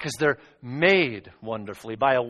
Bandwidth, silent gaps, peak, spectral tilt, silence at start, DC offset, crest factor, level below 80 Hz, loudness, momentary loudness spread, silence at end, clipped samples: 12.5 kHz; none; -6 dBFS; -5 dB/octave; 0 s; under 0.1%; 20 dB; -60 dBFS; -24 LUFS; 17 LU; 0 s; under 0.1%